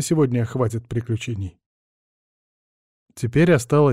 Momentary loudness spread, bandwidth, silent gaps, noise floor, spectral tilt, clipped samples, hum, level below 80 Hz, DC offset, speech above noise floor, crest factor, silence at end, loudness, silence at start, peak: 13 LU; 15 kHz; 1.66-3.06 s; under -90 dBFS; -6.5 dB/octave; under 0.1%; none; -50 dBFS; under 0.1%; over 70 dB; 16 dB; 0 s; -21 LUFS; 0 s; -6 dBFS